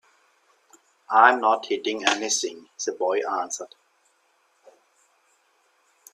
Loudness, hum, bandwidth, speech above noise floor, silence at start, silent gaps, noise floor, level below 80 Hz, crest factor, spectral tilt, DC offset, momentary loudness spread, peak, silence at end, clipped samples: -23 LUFS; none; 14 kHz; 43 dB; 1.1 s; none; -66 dBFS; -80 dBFS; 26 dB; 0 dB/octave; under 0.1%; 15 LU; -2 dBFS; 2.5 s; under 0.1%